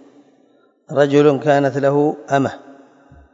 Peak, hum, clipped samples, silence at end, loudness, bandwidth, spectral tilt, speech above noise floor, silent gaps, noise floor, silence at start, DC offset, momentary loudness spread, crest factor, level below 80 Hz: -2 dBFS; none; under 0.1%; 0.6 s; -16 LUFS; 7.8 kHz; -7 dB/octave; 40 dB; none; -56 dBFS; 0.9 s; under 0.1%; 11 LU; 16 dB; -60 dBFS